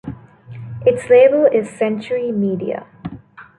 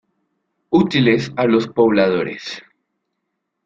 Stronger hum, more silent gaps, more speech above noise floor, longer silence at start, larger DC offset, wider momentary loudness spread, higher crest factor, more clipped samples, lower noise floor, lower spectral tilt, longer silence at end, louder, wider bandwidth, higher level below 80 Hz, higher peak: neither; neither; second, 23 dB vs 59 dB; second, 0.05 s vs 0.7 s; neither; first, 22 LU vs 15 LU; about the same, 16 dB vs 18 dB; neither; second, -39 dBFS vs -75 dBFS; about the same, -7 dB/octave vs -6.5 dB/octave; second, 0.15 s vs 1.05 s; about the same, -16 LUFS vs -16 LUFS; first, 10.5 kHz vs 7.6 kHz; about the same, -52 dBFS vs -54 dBFS; about the same, -2 dBFS vs -2 dBFS